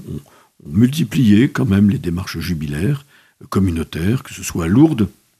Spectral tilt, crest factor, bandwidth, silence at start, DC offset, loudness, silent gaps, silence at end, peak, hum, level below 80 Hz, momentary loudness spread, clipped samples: -6.5 dB/octave; 16 dB; 14.5 kHz; 0 s; under 0.1%; -17 LUFS; none; 0.3 s; 0 dBFS; none; -42 dBFS; 10 LU; under 0.1%